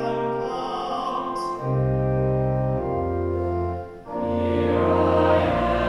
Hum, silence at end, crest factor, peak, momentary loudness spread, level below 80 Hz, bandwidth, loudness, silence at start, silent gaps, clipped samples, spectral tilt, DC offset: none; 0 s; 14 dB; -8 dBFS; 8 LU; -38 dBFS; 11 kHz; -23 LUFS; 0 s; none; under 0.1%; -8.5 dB/octave; under 0.1%